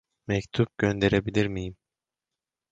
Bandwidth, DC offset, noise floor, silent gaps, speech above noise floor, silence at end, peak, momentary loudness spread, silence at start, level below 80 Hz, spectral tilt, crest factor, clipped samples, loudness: 7.8 kHz; under 0.1%; -89 dBFS; none; 64 dB; 1 s; -8 dBFS; 9 LU; 0.3 s; -48 dBFS; -6.5 dB/octave; 20 dB; under 0.1%; -27 LUFS